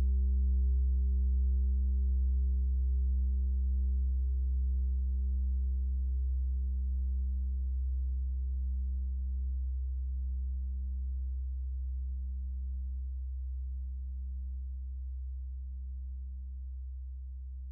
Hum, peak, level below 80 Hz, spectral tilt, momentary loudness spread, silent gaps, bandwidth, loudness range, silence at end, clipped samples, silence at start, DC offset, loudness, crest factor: none; -24 dBFS; -32 dBFS; -14 dB/octave; 11 LU; none; 0.4 kHz; 9 LU; 0 s; under 0.1%; 0 s; under 0.1%; -35 LUFS; 8 dB